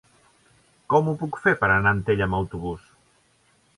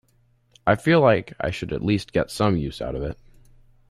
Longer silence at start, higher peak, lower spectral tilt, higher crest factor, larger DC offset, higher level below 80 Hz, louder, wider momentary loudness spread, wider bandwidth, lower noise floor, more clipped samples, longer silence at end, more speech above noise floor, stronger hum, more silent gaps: first, 0.9 s vs 0.65 s; about the same, -4 dBFS vs -4 dBFS; about the same, -7.5 dB/octave vs -6.5 dB/octave; about the same, 20 dB vs 18 dB; neither; about the same, -46 dBFS vs -44 dBFS; about the same, -23 LUFS vs -23 LUFS; about the same, 13 LU vs 13 LU; second, 11.5 kHz vs 13.5 kHz; about the same, -63 dBFS vs -62 dBFS; neither; first, 1 s vs 0.75 s; about the same, 40 dB vs 40 dB; neither; neither